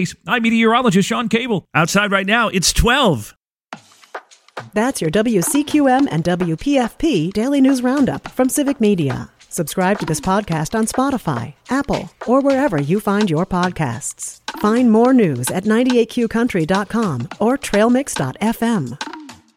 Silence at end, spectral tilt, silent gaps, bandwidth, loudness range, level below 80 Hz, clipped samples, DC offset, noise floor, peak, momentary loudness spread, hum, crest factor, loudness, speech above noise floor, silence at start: 0.25 s; -5 dB/octave; none; 16.5 kHz; 3 LU; -38 dBFS; under 0.1%; under 0.1%; -40 dBFS; -2 dBFS; 11 LU; none; 16 dB; -17 LUFS; 23 dB; 0 s